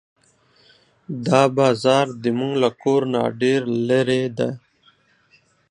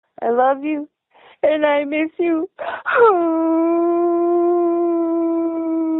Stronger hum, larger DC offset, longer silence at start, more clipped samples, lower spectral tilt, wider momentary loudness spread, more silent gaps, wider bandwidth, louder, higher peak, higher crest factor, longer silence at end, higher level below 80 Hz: neither; neither; first, 1.1 s vs 0.2 s; neither; first, -6 dB/octave vs -2.5 dB/octave; about the same, 9 LU vs 8 LU; neither; first, 10.5 kHz vs 4 kHz; about the same, -20 LUFS vs -18 LUFS; first, 0 dBFS vs -4 dBFS; first, 20 dB vs 14 dB; first, 1.15 s vs 0 s; about the same, -66 dBFS vs -66 dBFS